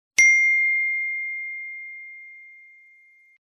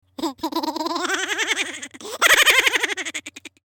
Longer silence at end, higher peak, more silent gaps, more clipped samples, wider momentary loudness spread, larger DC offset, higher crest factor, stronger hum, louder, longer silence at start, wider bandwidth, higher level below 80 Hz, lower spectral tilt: first, 0.95 s vs 0.15 s; first, 0 dBFS vs -4 dBFS; neither; neither; first, 24 LU vs 19 LU; neither; first, 24 dB vs 18 dB; neither; about the same, -19 LUFS vs -19 LUFS; about the same, 0.2 s vs 0.2 s; second, 12 kHz vs 19 kHz; second, -74 dBFS vs -60 dBFS; second, 3.5 dB/octave vs 0.5 dB/octave